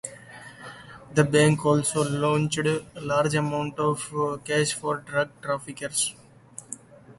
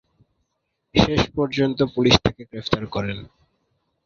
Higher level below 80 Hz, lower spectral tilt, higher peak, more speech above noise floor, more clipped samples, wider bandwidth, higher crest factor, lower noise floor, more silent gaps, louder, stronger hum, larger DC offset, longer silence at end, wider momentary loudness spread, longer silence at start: second, -58 dBFS vs -40 dBFS; about the same, -4.5 dB/octave vs -5.5 dB/octave; second, -6 dBFS vs 0 dBFS; second, 22 dB vs 55 dB; neither; first, 11.5 kHz vs 7.6 kHz; about the same, 20 dB vs 22 dB; second, -47 dBFS vs -76 dBFS; neither; second, -25 LUFS vs -21 LUFS; neither; neither; second, 0.05 s vs 0.8 s; first, 21 LU vs 12 LU; second, 0.05 s vs 0.95 s